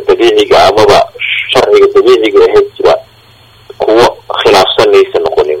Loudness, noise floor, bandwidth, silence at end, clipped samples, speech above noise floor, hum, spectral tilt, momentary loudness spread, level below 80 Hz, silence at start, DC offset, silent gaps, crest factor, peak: -7 LUFS; -40 dBFS; 15.5 kHz; 0 s; 4%; 35 dB; none; -4 dB/octave; 6 LU; -38 dBFS; 0 s; under 0.1%; none; 8 dB; 0 dBFS